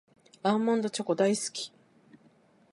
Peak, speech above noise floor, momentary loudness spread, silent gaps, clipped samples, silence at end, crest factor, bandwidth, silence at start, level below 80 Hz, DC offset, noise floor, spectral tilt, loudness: -12 dBFS; 35 dB; 10 LU; none; under 0.1%; 1.05 s; 18 dB; 11.5 kHz; 0.45 s; -82 dBFS; under 0.1%; -62 dBFS; -4.5 dB/octave; -29 LUFS